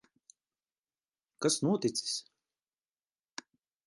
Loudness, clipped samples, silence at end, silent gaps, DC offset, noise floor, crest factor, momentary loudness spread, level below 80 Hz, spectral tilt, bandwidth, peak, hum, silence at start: -32 LUFS; under 0.1%; 1.65 s; none; under 0.1%; under -90 dBFS; 20 dB; 19 LU; -82 dBFS; -4 dB/octave; 11.5 kHz; -16 dBFS; none; 1.4 s